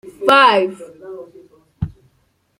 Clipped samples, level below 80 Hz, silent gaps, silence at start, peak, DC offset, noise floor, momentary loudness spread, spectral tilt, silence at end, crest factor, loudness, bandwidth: under 0.1%; -44 dBFS; none; 0.2 s; -2 dBFS; under 0.1%; -62 dBFS; 25 LU; -5 dB/octave; 0.7 s; 18 dB; -13 LUFS; 16.5 kHz